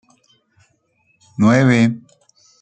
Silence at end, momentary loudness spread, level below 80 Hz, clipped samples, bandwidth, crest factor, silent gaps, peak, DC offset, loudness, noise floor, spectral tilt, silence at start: 0.65 s; 21 LU; -60 dBFS; under 0.1%; 8.8 kHz; 18 dB; none; 0 dBFS; under 0.1%; -15 LUFS; -62 dBFS; -7 dB/octave; 1.4 s